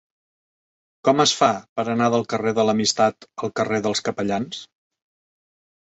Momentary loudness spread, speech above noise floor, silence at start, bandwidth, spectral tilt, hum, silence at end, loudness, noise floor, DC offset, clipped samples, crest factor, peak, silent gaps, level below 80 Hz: 10 LU; over 69 dB; 1.05 s; 8.4 kHz; -4 dB/octave; none; 1.2 s; -21 LUFS; under -90 dBFS; under 0.1%; under 0.1%; 20 dB; -4 dBFS; 1.69-1.76 s; -62 dBFS